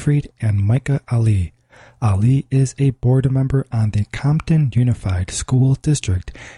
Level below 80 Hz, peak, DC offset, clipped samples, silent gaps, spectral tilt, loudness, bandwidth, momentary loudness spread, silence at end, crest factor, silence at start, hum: -38 dBFS; -6 dBFS; under 0.1%; under 0.1%; none; -7 dB/octave; -18 LUFS; 11.5 kHz; 6 LU; 0.05 s; 12 dB; 0 s; none